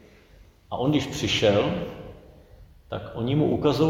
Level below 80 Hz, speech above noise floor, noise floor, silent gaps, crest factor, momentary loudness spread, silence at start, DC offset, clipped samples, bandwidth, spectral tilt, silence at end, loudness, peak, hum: -48 dBFS; 30 dB; -53 dBFS; none; 18 dB; 16 LU; 0.7 s; under 0.1%; under 0.1%; 16.5 kHz; -6 dB/octave; 0 s; -25 LUFS; -8 dBFS; none